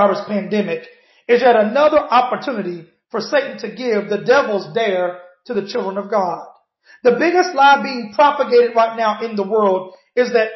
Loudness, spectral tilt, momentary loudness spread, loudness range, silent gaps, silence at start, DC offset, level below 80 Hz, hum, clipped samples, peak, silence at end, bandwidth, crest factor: -17 LUFS; -5.5 dB/octave; 13 LU; 4 LU; none; 0 s; under 0.1%; -64 dBFS; none; under 0.1%; -2 dBFS; 0 s; 6.2 kHz; 14 dB